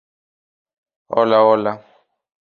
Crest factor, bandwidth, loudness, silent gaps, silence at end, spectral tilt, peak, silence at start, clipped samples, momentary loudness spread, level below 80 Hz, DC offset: 18 dB; 4.8 kHz; -16 LUFS; none; 0.75 s; -7.5 dB/octave; -2 dBFS; 1.1 s; under 0.1%; 13 LU; -66 dBFS; under 0.1%